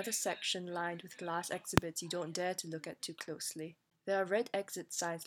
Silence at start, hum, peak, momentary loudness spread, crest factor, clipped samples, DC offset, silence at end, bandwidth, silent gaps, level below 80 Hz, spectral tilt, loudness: 0 s; none; -6 dBFS; 10 LU; 32 dB; under 0.1%; under 0.1%; 0 s; 19 kHz; none; -62 dBFS; -3.5 dB/octave; -38 LUFS